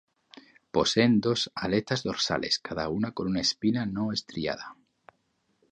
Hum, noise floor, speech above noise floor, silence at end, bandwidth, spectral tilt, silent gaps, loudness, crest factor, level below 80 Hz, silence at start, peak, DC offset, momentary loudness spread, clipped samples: none; -73 dBFS; 46 dB; 1 s; 9.4 kHz; -4.5 dB/octave; none; -28 LUFS; 20 dB; -56 dBFS; 0.75 s; -8 dBFS; under 0.1%; 10 LU; under 0.1%